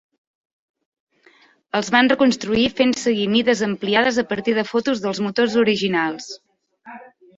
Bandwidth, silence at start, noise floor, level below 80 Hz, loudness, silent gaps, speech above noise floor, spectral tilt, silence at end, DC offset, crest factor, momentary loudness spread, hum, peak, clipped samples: 7.8 kHz; 1.75 s; -54 dBFS; -56 dBFS; -19 LUFS; none; 36 dB; -4.5 dB/octave; 0.35 s; under 0.1%; 18 dB; 9 LU; none; -2 dBFS; under 0.1%